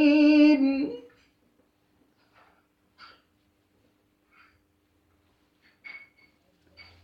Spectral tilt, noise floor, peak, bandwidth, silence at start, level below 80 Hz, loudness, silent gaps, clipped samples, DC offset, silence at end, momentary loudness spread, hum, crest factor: -5.5 dB/octave; -69 dBFS; -10 dBFS; 6 kHz; 0 s; -72 dBFS; -21 LUFS; none; under 0.1%; under 0.1%; 1.05 s; 28 LU; none; 18 dB